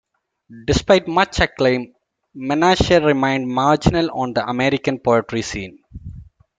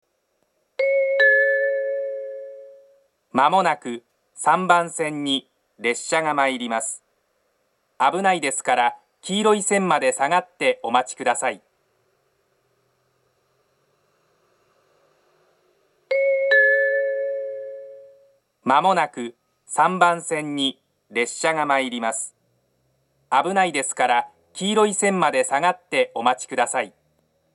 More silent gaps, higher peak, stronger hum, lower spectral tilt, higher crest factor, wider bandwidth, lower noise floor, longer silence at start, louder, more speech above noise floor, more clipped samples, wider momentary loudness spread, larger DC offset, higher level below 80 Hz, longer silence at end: neither; about the same, 0 dBFS vs 0 dBFS; neither; first, -5.5 dB/octave vs -3 dB/octave; about the same, 18 dB vs 22 dB; second, 9.4 kHz vs 12 kHz; second, -39 dBFS vs -70 dBFS; second, 0.5 s vs 0.8 s; first, -18 LUFS vs -21 LUFS; second, 22 dB vs 49 dB; neither; first, 18 LU vs 14 LU; neither; first, -36 dBFS vs -80 dBFS; second, 0.35 s vs 0.65 s